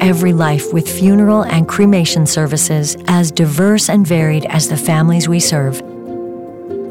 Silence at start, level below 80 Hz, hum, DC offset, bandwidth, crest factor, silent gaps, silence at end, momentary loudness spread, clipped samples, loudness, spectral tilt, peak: 0 s; -50 dBFS; none; 0.3%; 17 kHz; 10 dB; none; 0 s; 14 LU; under 0.1%; -12 LUFS; -5 dB/octave; -2 dBFS